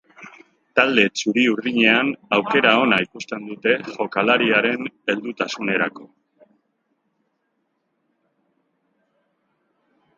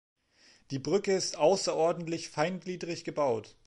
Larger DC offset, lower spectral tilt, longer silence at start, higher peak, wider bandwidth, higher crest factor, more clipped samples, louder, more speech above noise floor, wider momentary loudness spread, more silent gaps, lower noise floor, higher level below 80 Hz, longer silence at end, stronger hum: neither; about the same, -4 dB/octave vs -4.5 dB/octave; second, 0.2 s vs 0.7 s; first, 0 dBFS vs -14 dBFS; second, 7.8 kHz vs 11.5 kHz; about the same, 22 dB vs 18 dB; neither; first, -19 LUFS vs -31 LUFS; first, 52 dB vs 33 dB; about the same, 10 LU vs 11 LU; neither; first, -72 dBFS vs -63 dBFS; about the same, -68 dBFS vs -70 dBFS; first, 4.1 s vs 0.15 s; neither